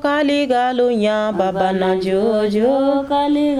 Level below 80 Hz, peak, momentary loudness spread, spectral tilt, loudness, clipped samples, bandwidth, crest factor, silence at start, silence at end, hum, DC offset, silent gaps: -50 dBFS; -6 dBFS; 2 LU; -6.5 dB/octave; -17 LUFS; under 0.1%; 12 kHz; 12 dB; 0 s; 0 s; none; under 0.1%; none